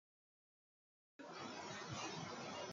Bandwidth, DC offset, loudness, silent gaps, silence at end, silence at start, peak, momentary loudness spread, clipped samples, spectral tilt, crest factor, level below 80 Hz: 9 kHz; under 0.1%; -49 LUFS; none; 0 s; 1.2 s; -34 dBFS; 7 LU; under 0.1%; -3.5 dB/octave; 18 dB; -84 dBFS